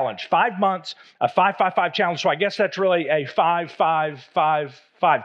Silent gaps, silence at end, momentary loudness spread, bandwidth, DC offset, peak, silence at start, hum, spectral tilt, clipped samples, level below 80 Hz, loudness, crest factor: none; 0 s; 6 LU; 8 kHz; under 0.1%; -4 dBFS; 0 s; none; -5 dB/octave; under 0.1%; -88 dBFS; -21 LUFS; 18 dB